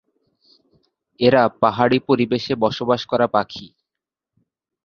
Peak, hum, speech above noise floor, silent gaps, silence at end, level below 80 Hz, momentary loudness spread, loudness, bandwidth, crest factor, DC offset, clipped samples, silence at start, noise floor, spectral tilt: -2 dBFS; none; 68 dB; none; 1.2 s; -56 dBFS; 6 LU; -18 LUFS; 6.8 kHz; 20 dB; under 0.1%; under 0.1%; 1.2 s; -86 dBFS; -7 dB/octave